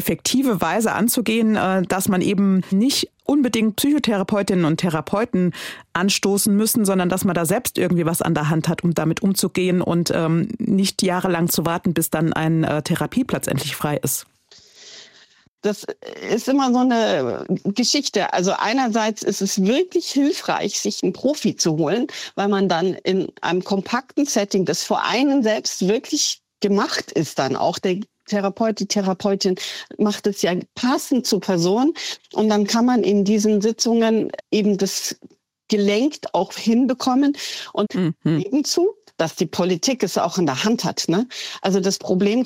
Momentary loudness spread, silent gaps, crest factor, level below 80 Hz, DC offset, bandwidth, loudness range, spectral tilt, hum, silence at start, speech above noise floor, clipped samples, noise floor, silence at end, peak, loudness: 6 LU; 15.48-15.58 s; 16 dB; -58 dBFS; under 0.1%; 16 kHz; 3 LU; -4.5 dB/octave; none; 0 s; 34 dB; under 0.1%; -53 dBFS; 0 s; -4 dBFS; -20 LUFS